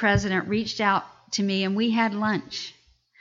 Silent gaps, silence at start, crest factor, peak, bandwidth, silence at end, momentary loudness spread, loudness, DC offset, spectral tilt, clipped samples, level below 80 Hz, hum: none; 0 s; 16 dB; -8 dBFS; 7.6 kHz; 0.5 s; 9 LU; -25 LUFS; under 0.1%; -5 dB/octave; under 0.1%; -48 dBFS; none